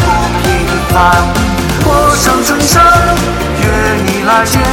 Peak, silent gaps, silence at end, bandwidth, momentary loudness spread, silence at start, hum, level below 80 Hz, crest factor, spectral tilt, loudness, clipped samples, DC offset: 0 dBFS; none; 0 s; 17.5 kHz; 6 LU; 0 s; none; -20 dBFS; 10 dB; -4.5 dB/octave; -9 LUFS; under 0.1%; under 0.1%